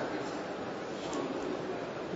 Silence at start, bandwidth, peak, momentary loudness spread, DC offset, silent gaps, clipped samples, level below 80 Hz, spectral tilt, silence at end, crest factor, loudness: 0 s; 7.6 kHz; -24 dBFS; 3 LU; under 0.1%; none; under 0.1%; -66 dBFS; -4 dB/octave; 0 s; 14 dB; -37 LUFS